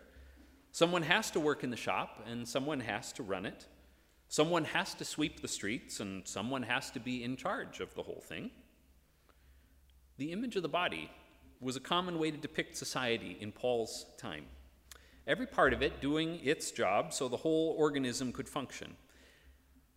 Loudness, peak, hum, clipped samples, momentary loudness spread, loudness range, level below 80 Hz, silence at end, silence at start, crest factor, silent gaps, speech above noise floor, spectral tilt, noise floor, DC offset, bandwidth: -36 LUFS; -10 dBFS; none; under 0.1%; 14 LU; 7 LU; -62 dBFS; 0.45 s; 0 s; 28 dB; none; 31 dB; -4 dB/octave; -67 dBFS; under 0.1%; 16 kHz